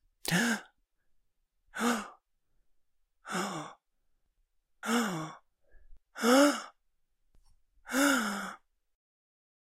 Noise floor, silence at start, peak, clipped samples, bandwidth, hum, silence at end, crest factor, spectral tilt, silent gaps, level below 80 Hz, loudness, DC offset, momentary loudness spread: -75 dBFS; 0.25 s; -12 dBFS; under 0.1%; 16 kHz; none; 1.1 s; 24 dB; -3.5 dB/octave; none; -68 dBFS; -30 LUFS; under 0.1%; 20 LU